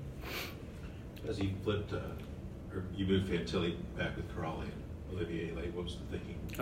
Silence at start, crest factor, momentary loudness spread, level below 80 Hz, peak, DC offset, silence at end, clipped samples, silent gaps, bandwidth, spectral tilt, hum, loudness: 0 s; 18 dB; 12 LU; -50 dBFS; -20 dBFS; under 0.1%; 0 s; under 0.1%; none; 16 kHz; -6.5 dB/octave; none; -39 LUFS